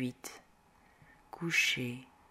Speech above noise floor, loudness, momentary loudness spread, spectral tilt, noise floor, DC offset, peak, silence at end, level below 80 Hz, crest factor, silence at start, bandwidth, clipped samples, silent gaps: 30 dB; -32 LUFS; 20 LU; -3 dB/octave; -65 dBFS; under 0.1%; -16 dBFS; 0.25 s; -72 dBFS; 22 dB; 0 s; 16 kHz; under 0.1%; none